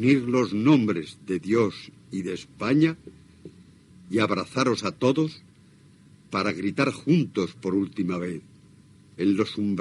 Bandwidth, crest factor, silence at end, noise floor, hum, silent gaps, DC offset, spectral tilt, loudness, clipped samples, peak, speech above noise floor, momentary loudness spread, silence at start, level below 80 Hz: 11.5 kHz; 18 dB; 0 s; -54 dBFS; none; none; under 0.1%; -6.5 dB/octave; -25 LUFS; under 0.1%; -6 dBFS; 30 dB; 10 LU; 0 s; -66 dBFS